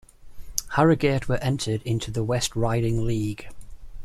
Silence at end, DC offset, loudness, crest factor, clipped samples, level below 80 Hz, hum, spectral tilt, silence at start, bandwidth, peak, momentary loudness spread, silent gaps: 0 s; under 0.1%; -25 LUFS; 24 dB; under 0.1%; -40 dBFS; none; -5.5 dB/octave; 0.2 s; 15 kHz; 0 dBFS; 11 LU; none